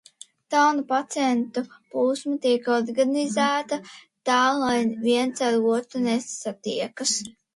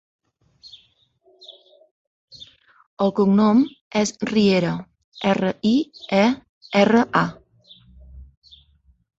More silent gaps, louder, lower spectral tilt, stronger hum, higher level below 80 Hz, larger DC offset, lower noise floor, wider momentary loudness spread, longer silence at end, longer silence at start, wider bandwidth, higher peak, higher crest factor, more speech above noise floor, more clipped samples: second, none vs 1.91-2.28 s, 2.87-2.97 s, 3.81-3.91 s, 5.04-5.12 s, 6.49-6.61 s; second, -24 LUFS vs -20 LUFS; second, -3 dB/octave vs -6 dB/octave; neither; second, -70 dBFS vs -54 dBFS; neither; second, -44 dBFS vs -60 dBFS; about the same, 10 LU vs 12 LU; second, 0.25 s vs 0.95 s; second, 0.5 s vs 1.5 s; first, 11.5 kHz vs 8 kHz; second, -8 dBFS vs -2 dBFS; about the same, 16 dB vs 20 dB; second, 21 dB vs 42 dB; neither